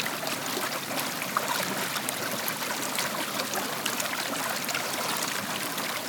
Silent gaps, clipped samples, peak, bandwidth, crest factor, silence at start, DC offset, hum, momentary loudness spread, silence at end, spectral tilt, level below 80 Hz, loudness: none; under 0.1%; -6 dBFS; over 20 kHz; 26 dB; 0 s; under 0.1%; none; 2 LU; 0 s; -1.5 dB/octave; -78 dBFS; -29 LUFS